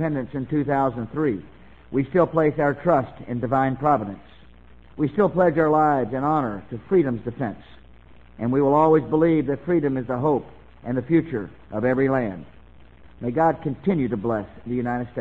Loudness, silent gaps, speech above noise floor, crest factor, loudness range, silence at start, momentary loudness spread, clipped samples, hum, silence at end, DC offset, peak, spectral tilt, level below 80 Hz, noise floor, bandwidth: -23 LUFS; none; 28 dB; 16 dB; 3 LU; 0 s; 12 LU; under 0.1%; none; 0 s; 0.3%; -6 dBFS; -10.5 dB/octave; -50 dBFS; -49 dBFS; 7.2 kHz